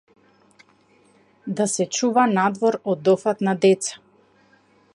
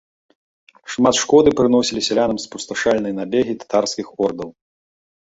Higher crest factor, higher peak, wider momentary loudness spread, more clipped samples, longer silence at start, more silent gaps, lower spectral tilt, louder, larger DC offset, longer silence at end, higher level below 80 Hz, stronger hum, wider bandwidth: about the same, 18 dB vs 18 dB; about the same, -4 dBFS vs -2 dBFS; second, 8 LU vs 13 LU; neither; first, 1.45 s vs 0.85 s; neither; about the same, -4.5 dB/octave vs -4 dB/octave; second, -21 LUFS vs -18 LUFS; neither; first, 1 s vs 0.7 s; second, -74 dBFS vs -52 dBFS; neither; first, 11.5 kHz vs 8.2 kHz